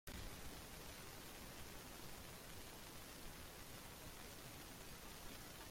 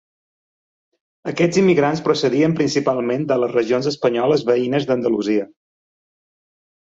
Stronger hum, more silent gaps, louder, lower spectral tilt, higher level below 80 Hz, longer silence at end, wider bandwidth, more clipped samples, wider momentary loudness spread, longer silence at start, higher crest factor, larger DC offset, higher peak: neither; neither; second, -55 LUFS vs -18 LUFS; second, -3 dB/octave vs -6 dB/octave; about the same, -62 dBFS vs -60 dBFS; second, 0 s vs 1.35 s; first, 16.5 kHz vs 7.8 kHz; neither; second, 1 LU vs 6 LU; second, 0.05 s vs 1.25 s; first, 24 dB vs 16 dB; neither; second, -32 dBFS vs -4 dBFS